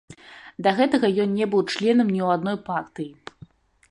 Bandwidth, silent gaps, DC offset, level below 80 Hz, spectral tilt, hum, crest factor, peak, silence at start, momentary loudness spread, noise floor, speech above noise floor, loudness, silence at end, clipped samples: 11 kHz; none; under 0.1%; -64 dBFS; -6.5 dB/octave; none; 16 dB; -6 dBFS; 0.1 s; 21 LU; -50 dBFS; 28 dB; -22 LUFS; 0.75 s; under 0.1%